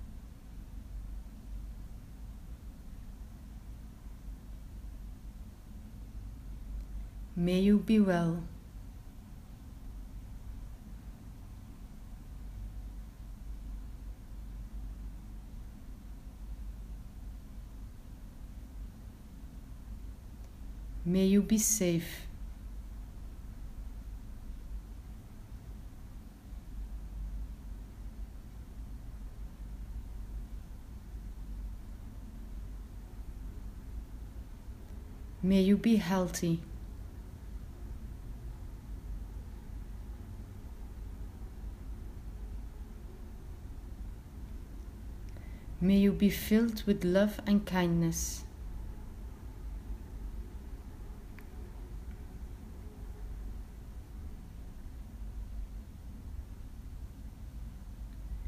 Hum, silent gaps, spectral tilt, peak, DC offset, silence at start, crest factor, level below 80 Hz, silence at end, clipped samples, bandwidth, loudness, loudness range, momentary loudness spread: none; none; -5.5 dB/octave; -14 dBFS; under 0.1%; 0 s; 22 dB; -44 dBFS; 0 s; under 0.1%; 15.5 kHz; -36 LUFS; 17 LU; 21 LU